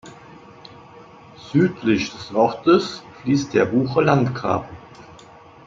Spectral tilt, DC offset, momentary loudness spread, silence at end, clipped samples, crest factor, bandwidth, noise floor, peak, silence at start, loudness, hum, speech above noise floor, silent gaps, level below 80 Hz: -6.5 dB/octave; under 0.1%; 11 LU; 0.55 s; under 0.1%; 20 dB; 7.6 kHz; -45 dBFS; -2 dBFS; 0.05 s; -20 LUFS; none; 26 dB; none; -56 dBFS